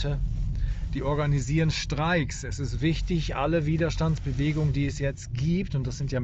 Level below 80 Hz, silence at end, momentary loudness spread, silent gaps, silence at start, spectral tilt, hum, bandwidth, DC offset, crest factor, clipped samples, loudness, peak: -34 dBFS; 0 s; 6 LU; none; 0 s; -6.5 dB/octave; none; 8.4 kHz; under 0.1%; 12 dB; under 0.1%; -27 LUFS; -14 dBFS